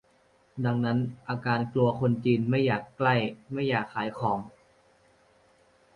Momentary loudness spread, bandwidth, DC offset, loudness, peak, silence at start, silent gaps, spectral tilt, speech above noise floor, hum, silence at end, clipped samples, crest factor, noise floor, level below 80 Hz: 8 LU; 5.4 kHz; under 0.1%; -28 LUFS; -12 dBFS; 0.55 s; none; -8.5 dB/octave; 37 dB; none; 1.45 s; under 0.1%; 16 dB; -64 dBFS; -62 dBFS